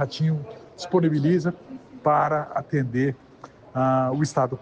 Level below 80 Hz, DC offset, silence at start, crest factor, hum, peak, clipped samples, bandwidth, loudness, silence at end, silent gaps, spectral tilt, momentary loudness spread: -62 dBFS; under 0.1%; 0 s; 14 dB; none; -10 dBFS; under 0.1%; 9 kHz; -24 LUFS; 0 s; none; -7.5 dB/octave; 17 LU